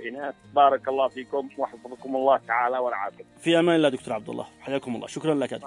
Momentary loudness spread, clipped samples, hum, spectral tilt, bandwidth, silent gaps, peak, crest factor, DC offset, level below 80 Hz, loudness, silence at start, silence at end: 13 LU; under 0.1%; none; -5.5 dB/octave; 11 kHz; none; -6 dBFS; 18 dB; under 0.1%; -70 dBFS; -25 LUFS; 0 s; 0 s